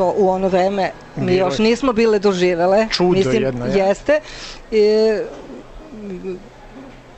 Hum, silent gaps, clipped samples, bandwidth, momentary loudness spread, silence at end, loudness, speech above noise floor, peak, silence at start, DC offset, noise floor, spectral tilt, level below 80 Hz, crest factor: none; none; under 0.1%; 8.6 kHz; 17 LU; 0.05 s; -17 LUFS; 21 dB; -4 dBFS; 0 s; under 0.1%; -38 dBFS; -6 dB/octave; -42 dBFS; 12 dB